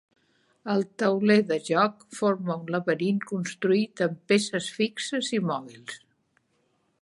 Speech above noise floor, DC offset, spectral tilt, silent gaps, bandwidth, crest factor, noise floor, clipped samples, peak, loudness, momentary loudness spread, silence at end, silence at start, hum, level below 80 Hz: 45 dB; under 0.1%; -5 dB/octave; none; 11.5 kHz; 20 dB; -71 dBFS; under 0.1%; -8 dBFS; -26 LUFS; 10 LU; 1.05 s; 0.65 s; none; -76 dBFS